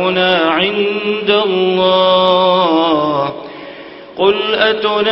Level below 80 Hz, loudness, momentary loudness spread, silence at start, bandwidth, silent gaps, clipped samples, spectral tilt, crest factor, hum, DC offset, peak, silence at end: -52 dBFS; -13 LUFS; 18 LU; 0 s; 5.8 kHz; none; under 0.1%; -7.5 dB/octave; 14 dB; none; under 0.1%; 0 dBFS; 0 s